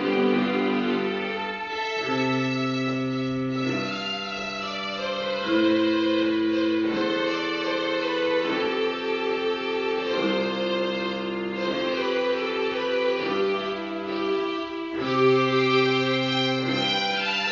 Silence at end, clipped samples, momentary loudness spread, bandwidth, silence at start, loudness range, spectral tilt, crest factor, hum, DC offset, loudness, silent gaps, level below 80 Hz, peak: 0 s; under 0.1%; 8 LU; 7.2 kHz; 0 s; 3 LU; -3 dB/octave; 16 dB; none; under 0.1%; -25 LUFS; none; -64 dBFS; -10 dBFS